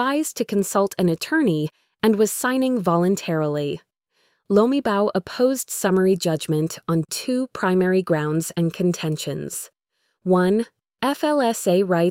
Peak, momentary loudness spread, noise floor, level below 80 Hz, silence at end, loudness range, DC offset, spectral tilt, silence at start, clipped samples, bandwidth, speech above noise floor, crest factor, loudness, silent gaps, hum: -4 dBFS; 8 LU; -73 dBFS; -60 dBFS; 0 s; 2 LU; under 0.1%; -5.5 dB/octave; 0 s; under 0.1%; 16.5 kHz; 52 dB; 16 dB; -21 LUFS; none; none